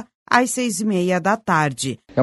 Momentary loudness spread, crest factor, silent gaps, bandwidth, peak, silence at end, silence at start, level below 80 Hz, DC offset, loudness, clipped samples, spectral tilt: 5 LU; 20 dB; 0.15-0.26 s; 12 kHz; 0 dBFS; 0 s; 0 s; -60 dBFS; under 0.1%; -20 LUFS; under 0.1%; -4.5 dB/octave